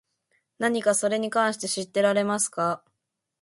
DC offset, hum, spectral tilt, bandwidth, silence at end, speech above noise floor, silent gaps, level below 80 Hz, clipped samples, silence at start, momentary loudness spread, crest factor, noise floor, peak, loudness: under 0.1%; none; -3 dB/octave; 11.5 kHz; 0.65 s; 57 dB; none; -74 dBFS; under 0.1%; 0.6 s; 6 LU; 18 dB; -81 dBFS; -8 dBFS; -25 LUFS